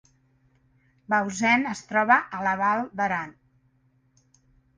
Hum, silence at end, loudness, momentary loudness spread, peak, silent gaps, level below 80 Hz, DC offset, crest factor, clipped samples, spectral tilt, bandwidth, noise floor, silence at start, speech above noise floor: none; 1.45 s; -24 LUFS; 7 LU; -6 dBFS; none; -68 dBFS; under 0.1%; 22 dB; under 0.1%; -4.5 dB/octave; 10 kHz; -65 dBFS; 1.1 s; 41 dB